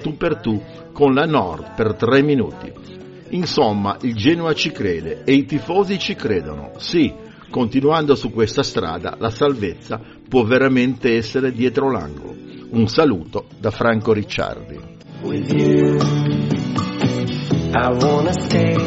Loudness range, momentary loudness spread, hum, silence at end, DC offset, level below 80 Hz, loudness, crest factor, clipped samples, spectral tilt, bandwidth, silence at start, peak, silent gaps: 2 LU; 14 LU; none; 0 s; under 0.1%; -44 dBFS; -18 LUFS; 18 dB; under 0.1%; -5.5 dB/octave; 8 kHz; 0 s; 0 dBFS; none